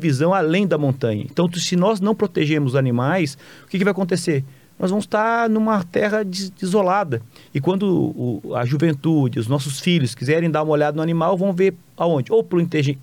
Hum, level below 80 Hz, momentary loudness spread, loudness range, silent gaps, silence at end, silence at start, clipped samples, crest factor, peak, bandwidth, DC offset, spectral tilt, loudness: none; -64 dBFS; 6 LU; 2 LU; none; 0 s; 0 s; under 0.1%; 12 dB; -8 dBFS; 17.5 kHz; under 0.1%; -6.5 dB/octave; -20 LUFS